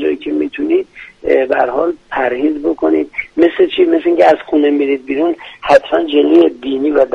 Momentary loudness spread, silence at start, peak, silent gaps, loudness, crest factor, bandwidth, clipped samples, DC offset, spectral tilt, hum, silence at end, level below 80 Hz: 8 LU; 0 s; 0 dBFS; none; -13 LUFS; 12 dB; 7.4 kHz; under 0.1%; under 0.1%; -5.5 dB/octave; none; 0 s; -48 dBFS